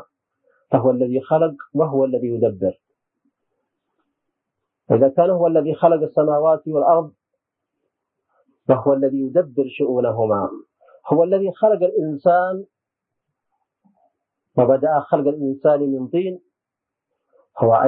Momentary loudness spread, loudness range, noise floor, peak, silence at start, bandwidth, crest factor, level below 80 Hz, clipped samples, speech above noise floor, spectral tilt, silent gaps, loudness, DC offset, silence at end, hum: 8 LU; 5 LU; -84 dBFS; -2 dBFS; 0.7 s; 4 kHz; 18 dB; -66 dBFS; under 0.1%; 67 dB; -13 dB/octave; none; -19 LUFS; under 0.1%; 0 s; none